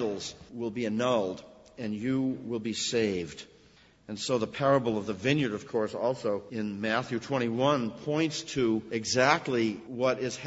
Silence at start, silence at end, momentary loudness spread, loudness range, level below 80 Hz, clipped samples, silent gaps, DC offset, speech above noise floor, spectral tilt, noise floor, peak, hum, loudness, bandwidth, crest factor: 0 s; 0 s; 10 LU; 3 LU; -64 dBFS; under 0.1%; none; under 0.1%; 30 dB; -5 dB/octave; -59 dBFS; -6 dBFS; none; -30 LUFS; 8 kHz; 24 dB